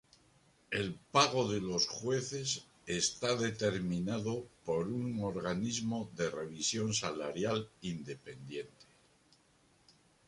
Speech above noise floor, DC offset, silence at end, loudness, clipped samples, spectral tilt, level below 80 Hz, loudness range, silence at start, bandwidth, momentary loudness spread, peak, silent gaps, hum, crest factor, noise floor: 33 dB; under 0.1%; 1.45 s; -35 LUFS; under 0.1%; -4 dB/octave; -66 dBFS; 5 LU; 0.7 s; 11.5 kHz; 10 LU; -12 dBFS; none; none; 24 dB; -69 dBFS